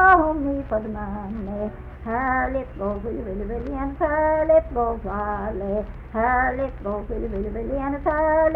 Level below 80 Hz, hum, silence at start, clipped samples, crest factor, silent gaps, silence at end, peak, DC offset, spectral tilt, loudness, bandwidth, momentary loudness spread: -34 dBFS; none; 0 s; under 0.1%; 20 dB; none; 0 s; -4 dBFS; under 0.1%; -10 dB/octave; -24 LUFS; 4.3 kHz; 11 LU